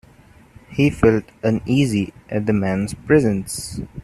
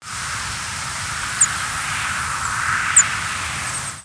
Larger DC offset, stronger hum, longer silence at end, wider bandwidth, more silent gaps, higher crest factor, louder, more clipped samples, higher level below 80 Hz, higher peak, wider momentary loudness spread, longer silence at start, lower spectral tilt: neither; neither; about the same, 0 s vs 0 s; first, 13.5 kHz vs 11 kHz; neither; about the same, 18 dB vs 20 dB; about the same, -20 LUFS vs -19 LUFS; neither; about the same, -42 dBFS vs -44 dBFS; about the same, -2 dBFS vs -2 dBFS; about the same, 11 LU vs 11 LU; first, 0.7 s vs 0 s; first, -6.5 dB/octave vs 0 dB/octave